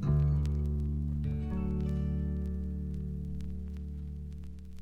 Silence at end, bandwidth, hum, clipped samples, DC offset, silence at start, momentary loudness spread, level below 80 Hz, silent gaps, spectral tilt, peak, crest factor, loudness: 0 s; 4.7 kHz; none; under 0.1%; under 0.1%; 0 s; 12 LU; -36 dBFS; none; -10 dB/octave; -18 dBFS; 14 dB; -35 LUFS